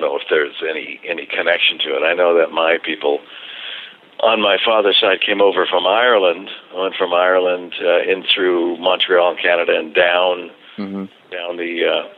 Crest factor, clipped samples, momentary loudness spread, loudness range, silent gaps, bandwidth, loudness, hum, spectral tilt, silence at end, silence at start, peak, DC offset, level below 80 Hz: 14 dB; under 0.1%; 15 LU; 2 LU; none; 4.8 kHz; -16 LUFS; none; -6 dB/octave; 0.05 s; 0 s; -2 dBFS; under 0.1%; -70 dBFS